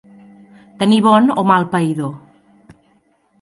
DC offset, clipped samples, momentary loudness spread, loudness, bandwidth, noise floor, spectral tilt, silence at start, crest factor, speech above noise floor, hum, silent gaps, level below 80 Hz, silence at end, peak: under 0.1%; under 0.1%; 11 LU; -14 LUFS; 11.5 kHz; -58 dBFS; -6.5 dB/octave; 0.8 s; 16 dB; 44 dB; none; none; -62 dBFS; 1.25 s; 0 dBFS